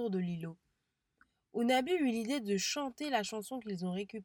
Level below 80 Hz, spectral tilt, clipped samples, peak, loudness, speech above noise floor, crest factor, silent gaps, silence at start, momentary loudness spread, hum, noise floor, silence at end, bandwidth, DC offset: -76 dBFS; -4.5 dB/octave; under 0.1%; -20 dBFS; -35 LUFS; 48 dB; 16 dB; none; 0 s; 11 LU; none; -83 dBFS; 0 s; 19 kHz; under 0.1%